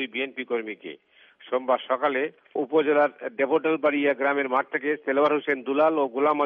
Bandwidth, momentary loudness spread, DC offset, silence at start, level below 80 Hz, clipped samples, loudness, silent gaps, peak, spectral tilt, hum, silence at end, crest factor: 4.9 kHz; 8 LU; under 0.1%; 0 s; -80 dBFS; under 0.1%; -24 LUFS; none; -10 dBFS; -2 dB/octave; none; 0 s; 14 dB